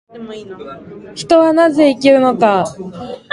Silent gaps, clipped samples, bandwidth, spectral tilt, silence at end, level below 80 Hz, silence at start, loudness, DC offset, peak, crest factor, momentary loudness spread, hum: none; under 0.1%; 11.5 kHz; -5.5 dB/octave; 0.15 s; -54 dBFS; 0.15 s; -12 LUFS; under 0.1%; 0 dBFS; 14 dB; 21 LU; none